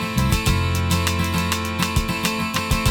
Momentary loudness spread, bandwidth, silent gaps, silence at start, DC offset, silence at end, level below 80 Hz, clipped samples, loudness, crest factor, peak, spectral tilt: 2 LU; 19 kHz; none; 0 s; under 0.1%; 0 s; -30 dBFS; under 0.1%; -21 LUFS; 18 dB; -2 dBFS; -4.5 dB/octave